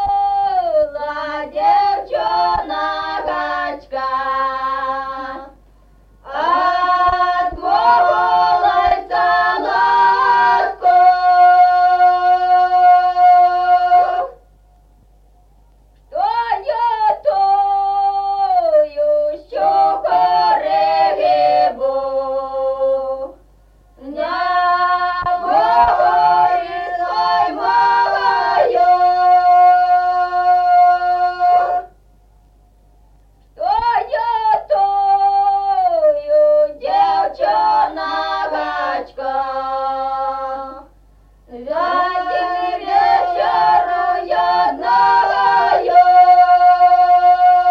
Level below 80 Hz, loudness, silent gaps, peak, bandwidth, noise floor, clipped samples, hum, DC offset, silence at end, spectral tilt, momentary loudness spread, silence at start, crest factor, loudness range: -48 dBFS; -15 LUFS; none; -2 dBFS; 6.2 kHz; -49 dBFS; under 0.1%; none; under 0.1%; 0 s; -4.5 dB/octave; 10 LU; 0 s; 14 dB; 8 LU